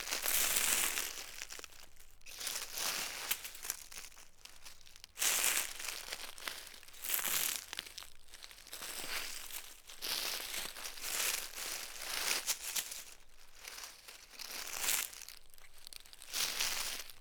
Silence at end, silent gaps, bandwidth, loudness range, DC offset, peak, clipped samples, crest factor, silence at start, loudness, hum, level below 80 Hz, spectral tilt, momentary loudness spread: 0 s; none; over 20 kHz; 5 LU; under 0.1%; -12 dBFS; under 0.1%; 28 dB; 0 s; -36 LUFS; none; -60 dBFS; 1.5 dB/octave; 21 LU